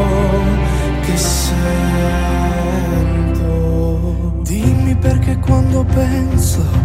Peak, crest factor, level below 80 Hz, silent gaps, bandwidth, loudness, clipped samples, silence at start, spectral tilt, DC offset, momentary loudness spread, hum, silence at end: 0 dBFS; 12 dB; -18 dBFS; none; 16 kHz; -15 LUFS; under 0.1%; 0 s; -6 dB/octave; under 0.1%; 3 LU; none; 0 s